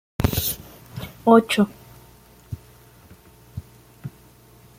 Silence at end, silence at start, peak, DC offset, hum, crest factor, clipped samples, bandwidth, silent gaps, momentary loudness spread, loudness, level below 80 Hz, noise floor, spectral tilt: 0.7 s; 0.2 s; -2 dBFS; under 0.1%; none; 22 dB; under 0.1%; 16.5 kHz; none; 24 LU; -20 LUFS; -42 dBFS; -50 dBFS; -5.5 dB/octave